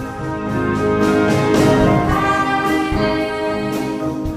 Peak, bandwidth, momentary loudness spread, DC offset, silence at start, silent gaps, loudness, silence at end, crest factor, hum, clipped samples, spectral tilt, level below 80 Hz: -2 dBFS; 15.5 kHz; 8 LU; under 0.1%; 0 s; none; -17 LUFS; 0 s; 14 dB; none; under 0.1%; -6.5 dB/octave; -32 dBFS